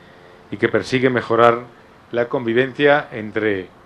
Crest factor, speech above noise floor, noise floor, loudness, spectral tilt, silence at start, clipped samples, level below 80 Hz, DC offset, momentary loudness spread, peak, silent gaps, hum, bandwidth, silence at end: 20 dB; 27 dB; -45 dBFS; -18 LUFS; -6.5 dB/octave; 0.5 s; under 0.1%; -56 dBFS; under 0.1%; 11 LU; 0 dBFS; none; none; 10.5 kHz; 0.2 s